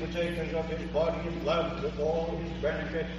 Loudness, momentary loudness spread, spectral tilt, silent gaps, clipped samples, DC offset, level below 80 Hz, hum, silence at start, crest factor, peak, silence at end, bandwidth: -31 LUFS; 3 LU; -6.5 dB/octave; none; under 0.1%; under 0.1%; -42 dBFS; 60 Hz at -40 dBFS; 0 s; 14 dB; -16 dBFS; 0 s; 11.5 kHz